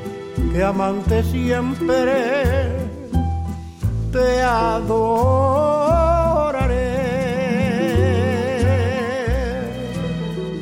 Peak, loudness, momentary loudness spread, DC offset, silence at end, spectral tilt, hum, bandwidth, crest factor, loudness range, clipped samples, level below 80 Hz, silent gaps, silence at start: -6 dBFS; -19 LUFS; 8 LU; under 0.1%; 0 s; -7 dB/octave; none; 16.5 kHz; 12 dB; 3 LU; under 0.1%; -28 dBFS; none; 0 s